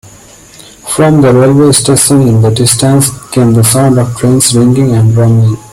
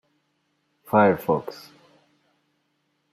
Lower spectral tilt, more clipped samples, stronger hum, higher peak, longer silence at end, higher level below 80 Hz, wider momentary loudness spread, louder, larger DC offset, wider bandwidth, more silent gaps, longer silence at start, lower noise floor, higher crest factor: second, -5.5 dB/octave vs -7.5 dB/octave; first, 0.2% vs under 0.1%; neither; first, 0 dBFS vs -6 dBFS; second, 0.15 s vs 1.6 s; first, -38 dBFS vs -66 dBFS; second, 4 LU vs 21 LU; first, -7 LUFS vs -21 LUFS; neither; about the same, 16 kHz vs 15.5 kHz; neither; about the same, 0.85 s vs 0.9 s; second, -35 dBFS vs -72 dBFS; second, 8 dB vs 22 dB